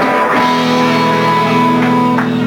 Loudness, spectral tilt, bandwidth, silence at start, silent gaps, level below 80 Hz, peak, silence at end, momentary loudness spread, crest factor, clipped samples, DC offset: -11 LUFS; -5.5 dB/octave; 18.5 kHz; 0 s; none; -50 dBFS; 0 dBFS; 0 s; 1 LU; 12 dB; under 0.1%; under 0.1%